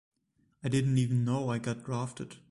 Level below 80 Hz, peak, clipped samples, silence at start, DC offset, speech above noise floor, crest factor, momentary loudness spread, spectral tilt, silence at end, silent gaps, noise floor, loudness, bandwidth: -62 dBFS; -16 dBFS; under 0.1%; 0.65 s; under 0.1%; 43 dB; 16 dB; 11 LU; -7 dB/octave; 0.15 s; none; -73 dBFS; -31 LUFS; 11.5 kHz